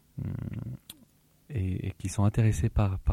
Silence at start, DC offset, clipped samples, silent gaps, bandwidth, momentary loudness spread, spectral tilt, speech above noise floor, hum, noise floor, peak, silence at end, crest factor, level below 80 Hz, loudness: 0.15 s; under 0.1%; under 0.1%; none; 14 kHz; 15 LU; -7 dB/octave; 36 dB; none; -62 dBFS; -14 dBFS; 0 s; 14 dB; -40 dBFS; -30 LUFS